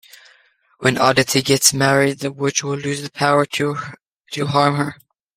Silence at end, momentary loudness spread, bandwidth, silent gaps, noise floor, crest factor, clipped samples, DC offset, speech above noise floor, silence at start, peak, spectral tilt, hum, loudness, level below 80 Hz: 0.4 s; 12 LU; 16.5 kHz; none; -56 dBFS; 20 dB; under 0.1%; under 0.1%; 38 dB; 0.8 s; 0 dBFS; -3.5 dB/octave; none; -17 LUFS; -56 dBFS